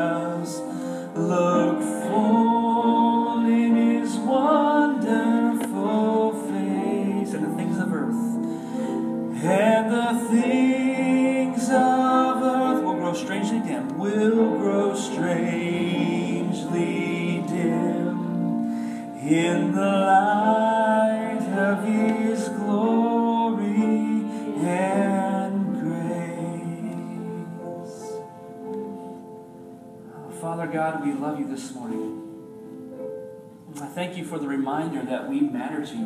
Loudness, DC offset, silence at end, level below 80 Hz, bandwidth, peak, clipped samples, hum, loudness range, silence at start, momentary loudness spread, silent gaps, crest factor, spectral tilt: -23 LUFS; under 0.1%; 0 s; -74 dBFS; 13.5 kHz; -6 dBFS; under 0.1%; none; 11 LU; 0 s; 15 LU; none; 16 dB; -6.5 dB/octave